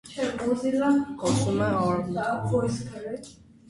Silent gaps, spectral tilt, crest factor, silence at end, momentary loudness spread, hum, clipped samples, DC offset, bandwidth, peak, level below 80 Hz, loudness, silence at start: none; -6 dB/octave; 14 dB; 0.4 s; 12 LU; none; under 0.1%; under 0.1%; 11.5 kHz; -12 dBFS; -54 dBFS; -26 LUFS; 0.05 s